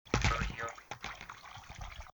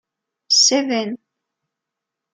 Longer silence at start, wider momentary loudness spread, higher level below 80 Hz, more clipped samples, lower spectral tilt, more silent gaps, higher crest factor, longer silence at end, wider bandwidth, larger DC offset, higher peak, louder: second, 0.05 s vs 0.5 s; about the same, 16 LU vs 17 LU; first, -44 dBFS vs -80 dBFS; neither; first, -4 dB/octave vs -0.5 dB/octave; neither; first, 26 dB vs 18 dB; second, 0.05 s vs 1.15 s; first, over 20 kHz vs 11 kHz; neither; second, -12 dBFS vs -4 dBFS; second, -38 LUFS vs -15 LUFS